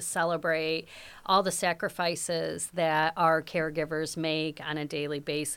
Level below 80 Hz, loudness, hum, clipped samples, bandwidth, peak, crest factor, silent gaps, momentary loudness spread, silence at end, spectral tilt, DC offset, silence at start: -64 dBFS; -29 LUFS; none; under 0.1%; 18.5 kHz; -10 dBFS; 20 dB; none; 8 LU; 0 s; -3.5 dB/octave; under 0.1%; 0 s